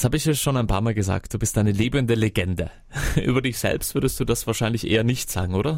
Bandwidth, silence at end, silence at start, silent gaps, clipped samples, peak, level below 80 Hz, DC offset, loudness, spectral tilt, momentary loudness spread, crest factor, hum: 16.5 kHz; 0 s; 0 s; none; under 0.1%; -4 dBFS; -36 dBFS; under 0.1%; -23 LUFS; -5 dB/octave; 4 LU; 18 dB; none